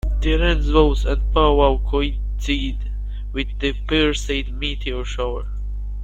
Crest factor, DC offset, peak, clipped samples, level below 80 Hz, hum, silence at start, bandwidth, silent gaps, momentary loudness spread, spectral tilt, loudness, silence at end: 18 dB; under 0.1%; -2 dBFS; under 0.1%; -22 dBFS; 50 Hz at -25 dBFS; 0.05 s; 8.2 kHz; none; 12 LU; -6 dB/octave; -21 LUFS; 0 s